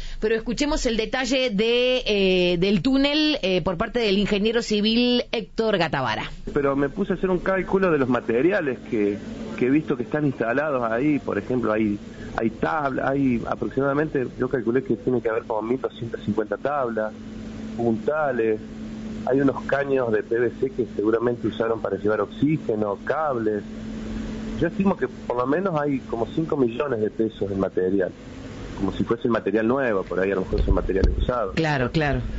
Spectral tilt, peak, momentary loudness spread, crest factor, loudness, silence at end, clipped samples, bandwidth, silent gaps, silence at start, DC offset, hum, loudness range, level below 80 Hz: -4.5 dB/octave; -6 dBFS; 8 LU; 16 dB; -23 LUFS; 0 s; under 0.1%; 8 kHz; none; 0 s; under 0.1%; none; 5 LU; -38 dBFS